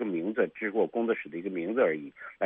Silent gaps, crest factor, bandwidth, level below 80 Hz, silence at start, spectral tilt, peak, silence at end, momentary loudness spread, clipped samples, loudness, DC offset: none; 18 dB; 3.8 kHz; -76 dBFS; 0 s; -5 dB/octave; -12 dBFS; 0 s; 8 LU; under 0.1%; -30 LUFS; under 0.1%